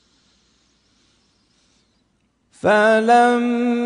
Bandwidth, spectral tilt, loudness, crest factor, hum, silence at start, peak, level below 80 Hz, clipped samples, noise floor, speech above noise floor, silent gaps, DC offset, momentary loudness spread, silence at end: 10 kHz; -5 dB/octave; -16 LUFS; 16 dB; none; 2.65 s; -4 dBFS; -66 dBFS; under 0.1%; -65 dBFS; 50 dB; none; under 0.1%; 6 LU; 0 s